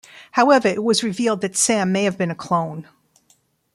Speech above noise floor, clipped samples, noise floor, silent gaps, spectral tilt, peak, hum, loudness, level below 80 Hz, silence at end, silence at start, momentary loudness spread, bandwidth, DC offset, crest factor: 42 dB; under 0.1%; -61 dBFS; none; -4 dB/octave; -2 dBFS; none; -19 LUFS; -64 dBFS; 0.9 s; 0.15 s; 10 LU; 13 kHz; under 0.1%; 18 dB